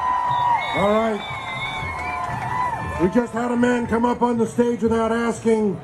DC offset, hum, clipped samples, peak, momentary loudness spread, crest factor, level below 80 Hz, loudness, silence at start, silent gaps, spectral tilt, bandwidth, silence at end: under 0.1%; none; under 0.1%; -6 dBFS; 7 LU; 16 dB; -46 dBFS; -21 LUFS; 0 s; none; -6 dB/octave; 12 kHz; 0 s